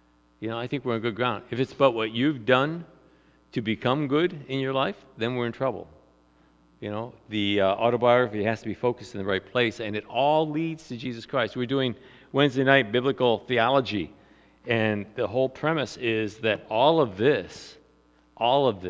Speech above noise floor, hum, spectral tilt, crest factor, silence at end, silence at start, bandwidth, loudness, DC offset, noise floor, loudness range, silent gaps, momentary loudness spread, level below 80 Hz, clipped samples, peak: 36 dB; none; -6.5 dB/octave; 22 dB; 0 s; 0.4 s; 8 kHz; -25 LUFS; under 0.1%; -61 dBFS; 4 LU; none; 13 LU; -60 dBFS; under 0.1%; -4 dBFS